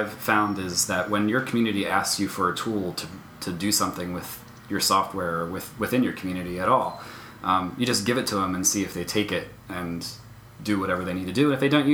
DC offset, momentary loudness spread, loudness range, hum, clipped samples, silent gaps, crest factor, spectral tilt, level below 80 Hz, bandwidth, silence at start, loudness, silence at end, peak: under 0.1%; 12 LU; 2 LU; none; under 0.1%; none; 22 dB; -3.5 dB/octave; -56 dBFS; over 20 kHz; 0 s; -25 LUFS; 0 s; -4 dBFS